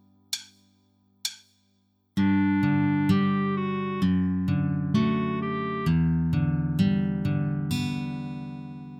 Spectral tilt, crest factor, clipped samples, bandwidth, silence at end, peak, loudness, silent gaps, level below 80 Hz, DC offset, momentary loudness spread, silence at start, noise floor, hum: -6.5 dB/octave; 16 dB; under 0.1%; 15 kHz; 0 s; -10 dBFS; -26 LUFS; none; -48 dBFS; under 0.1%; 11 LU; 0.3 s; -68 dBFS; none